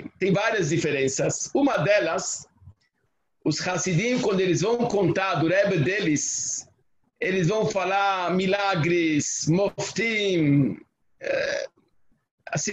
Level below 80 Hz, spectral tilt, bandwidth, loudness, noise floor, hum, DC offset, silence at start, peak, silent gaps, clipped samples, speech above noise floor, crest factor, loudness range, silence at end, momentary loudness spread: -60 dBFS; -4.5 dB/octave; 8.6 kHz; -24 LUFS; -74 dBFS; none; under 0.1%; 0 s; -8 dBFS; 12.31-12.38 s; under 0.1%; 51 dB; 16 dB; 2 LU; 0 s; 7 LU